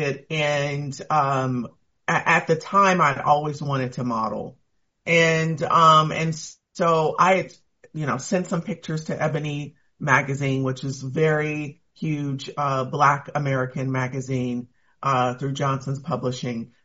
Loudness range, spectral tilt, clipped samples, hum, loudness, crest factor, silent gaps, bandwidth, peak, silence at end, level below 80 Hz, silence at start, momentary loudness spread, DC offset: 5 LU; -4.5 dB/octave; under 0.1%; none; -22 LUFS; 20 dB; none; 8 kHz; -2 dBFS; 0.2 s; -62 dBFS; 0 s; 13 LU; under 0.1%